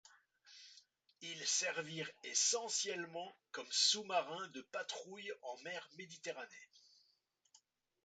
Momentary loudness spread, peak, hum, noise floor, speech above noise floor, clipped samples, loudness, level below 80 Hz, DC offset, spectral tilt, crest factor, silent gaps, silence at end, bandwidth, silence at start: 20 LU; -20 dBFS; none; -80 dBFS; 38 dB; under 0.1%; -39 LUFS; under -90 dBFS; under 0.1%; 0 dB/octave; 24 dB; none; 1.25 s; 9 kHz; 0.45 s